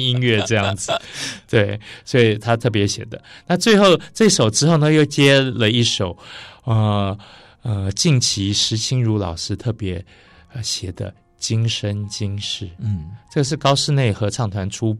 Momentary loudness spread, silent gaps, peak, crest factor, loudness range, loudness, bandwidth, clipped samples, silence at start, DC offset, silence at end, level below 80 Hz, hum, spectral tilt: 14 LU; none; -4 dBFS; 14 dB; 9 LU; -18 LUFS; 13 kHz; under 0.1%; 0 s; under 0.1%; 0 s; -48 dBFS; none; -4.5 dB/octave